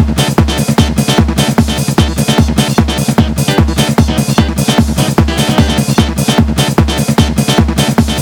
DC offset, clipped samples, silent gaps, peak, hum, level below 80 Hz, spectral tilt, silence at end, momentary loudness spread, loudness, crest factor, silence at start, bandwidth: under 0.1%; 0.8%; none; 0 dBFS; none; -20 dBFS; -5 dB/octave; 0 s; 1 LU; -11 LUFS; 10 dB; 0 s; 19.5 kHz